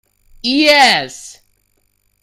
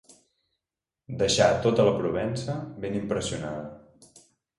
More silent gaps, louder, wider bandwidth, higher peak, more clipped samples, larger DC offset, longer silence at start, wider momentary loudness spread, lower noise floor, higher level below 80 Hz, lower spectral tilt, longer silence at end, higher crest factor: neither; first, -11 LUFS vs -26 LUFS; first, 16 kHz vs 11.5 kHz; first, 0 dBFS vs -8 dBFS; neither; neither; second, 0.45 s vs 1.1 s; first, 20 LU vs 15 LU; second, -61 dBFS vs -89 dBFS; about the same, -52 dBFS vs -54 dBFS; second, -2 dB/octave vs -4.5 dB/octave; about the same, 0.9 s vs 0.8 s; about the same, 16 dB vs 20 dB